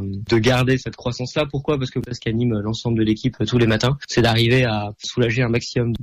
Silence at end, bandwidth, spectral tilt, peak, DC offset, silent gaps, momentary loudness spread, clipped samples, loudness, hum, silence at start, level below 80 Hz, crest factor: 0 s; 13 kHz; -6 dB/octave; -8 dBFS; under 0.1%; none; 8 LU; under 0.1%; -20 LUFS; none; 0 s; -42 dBFS; 12 dB